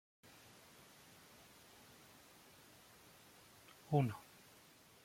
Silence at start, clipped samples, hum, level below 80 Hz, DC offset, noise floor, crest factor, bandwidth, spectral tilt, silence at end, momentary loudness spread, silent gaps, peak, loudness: 3.9 s; under 0.1%; none; -80 dBFS; under 0.1%; -65 dBFS; 26 dB; 16.5 kHz; -7 dB/octave; 0.85 s; 24 LU; none; -22 dBFS; -40 LUFS